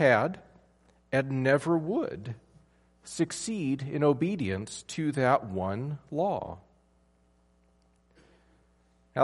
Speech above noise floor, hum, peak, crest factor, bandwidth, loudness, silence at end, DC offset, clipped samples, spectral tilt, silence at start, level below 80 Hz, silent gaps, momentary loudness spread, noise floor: 38 dB; none; -8 dBFS; 22 dB; 11.5 kHz; -29 LUFS; 0 s; under 0.1%; under 0.1%; -6 dB/octave; 0 s; -64 dBFS; none; 15 LU; -66 dBFS